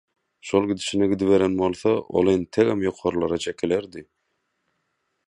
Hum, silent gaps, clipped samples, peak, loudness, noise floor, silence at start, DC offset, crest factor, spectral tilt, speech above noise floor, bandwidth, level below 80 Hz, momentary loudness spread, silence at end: none; none; under 0.1%; -6 dBFS; -22 LUFS; -75 dBFS; 0.45 s; under 0.1%; 18 dB; -6 dB/octave; 53 dB; 11 kHz; -52 dBFS; 7 LU; 1.25 s